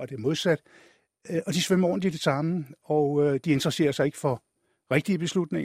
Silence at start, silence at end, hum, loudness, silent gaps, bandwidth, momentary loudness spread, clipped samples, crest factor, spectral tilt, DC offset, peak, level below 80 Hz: 0 s; 0 s; none; -26 LUFS; none; 15.5 kHz; 7 LU; under 0.1%; 20 dB; -5.5 dB/octave; under 0.1%; -6 dBFS; -64 dBFS